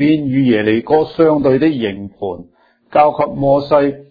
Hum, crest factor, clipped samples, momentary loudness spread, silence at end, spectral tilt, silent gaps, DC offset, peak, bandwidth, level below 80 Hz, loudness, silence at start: none; 14 dB; under 0.1%; 12 LU; 0.1 s; -10 dB/octave; none; under 0.1%; 0 dBFS; 5 kHz; -48 dBFS; -14 LUFS; 0 s